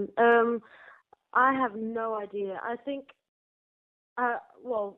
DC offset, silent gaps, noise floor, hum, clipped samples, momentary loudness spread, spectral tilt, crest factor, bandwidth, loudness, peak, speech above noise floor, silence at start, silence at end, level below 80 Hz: under 0.1%; 3.28-4.16 s; -54 dBFS; none; under 0.1%; 14 LU; -7.5 dB/octave; 18 dB; 3.9 kHz; -28 LUFS; -12 dBFS; 26 dB; 0 s; 0.05 s; -74 dBFS